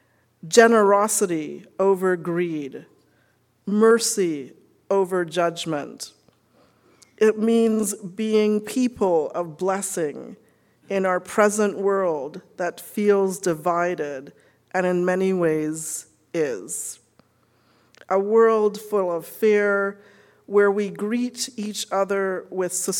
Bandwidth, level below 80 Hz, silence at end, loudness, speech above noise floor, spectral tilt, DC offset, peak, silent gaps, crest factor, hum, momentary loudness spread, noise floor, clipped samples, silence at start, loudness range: 18 kHz; -70 dBFS; 0 s; -22 LUFS; 42 dB; -4.5 dB/octave; under 0.1%; -2 dBFS; none; 20 dB; none; 13 LU; -63 dBFS; under 0.1%; 0.45 s; 4 LU